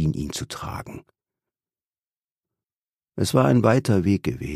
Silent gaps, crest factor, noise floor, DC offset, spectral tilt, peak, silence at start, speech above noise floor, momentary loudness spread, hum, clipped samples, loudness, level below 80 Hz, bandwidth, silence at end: 2.17-2.21 s, 2.31-2.36 s, 2.76-2.82 s, 2.89-2.93 s; 20 dB; under -90 dBFS; under 0.1%; -6.5 dB/octave; -4 dBFS; 0 s; over 68 dB; 17 LU; none; under 0.1%; -22 LUFS; -46 dBFS; 15.5 kHz; 0 s